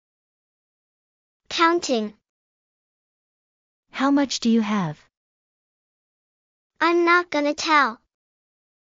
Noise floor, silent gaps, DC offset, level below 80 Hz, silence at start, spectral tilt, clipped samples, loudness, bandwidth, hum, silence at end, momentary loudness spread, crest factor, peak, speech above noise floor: under -90 dBFS; 2.29-3.83 s, 5.17-6.70 s; under 0.1%; -68 dBFS; 1.5 s; -4 dB/octave; under 0.1%; -21 LUFS; 7.6 kHz; none; 1 s; 10 LU; 20 dB; -6 dBFS; over 70 dB